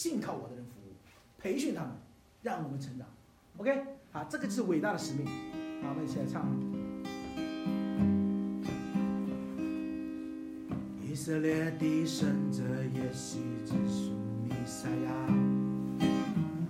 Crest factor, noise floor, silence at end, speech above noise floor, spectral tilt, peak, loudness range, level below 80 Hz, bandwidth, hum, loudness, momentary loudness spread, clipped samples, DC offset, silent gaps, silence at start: 16 dB; -58 dBFS; 0 s; 24 dB; -6.5 dB/octave; -18 dBFS; 5 LU; -62 dBFS; 15.5 kHz; none; -35 LUFS; 11 LU; under 0.1%; under 0.1%; none; 0 s